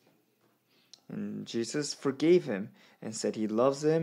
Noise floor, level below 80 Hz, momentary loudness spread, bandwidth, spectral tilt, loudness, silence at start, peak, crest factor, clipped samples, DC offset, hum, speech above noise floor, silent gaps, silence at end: -71 dBFS; -84 dBFS; 16 LU; 12 kHz; -5.5 dB/octave; -31 LUFS; 1.1 s; -14 dBFS; 18 dB; under 0.1%; under 0.1%; none; 41 dB; none; 0 s